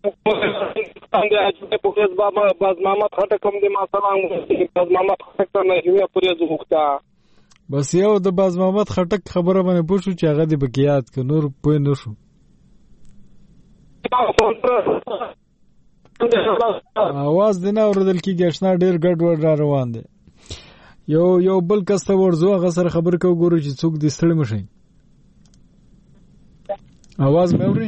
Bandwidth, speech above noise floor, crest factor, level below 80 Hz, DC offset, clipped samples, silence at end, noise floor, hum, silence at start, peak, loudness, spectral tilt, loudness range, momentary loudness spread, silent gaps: 8.4 kHz; 36 dB; 18 dB; -48 dBFS; under 0.1%; under 0.1%; 0 s; -53 dBFS; none; 0.05 s; 0 dBFS; -18 LUFS; -7 dB/octave; 5 LU; 9 LU; none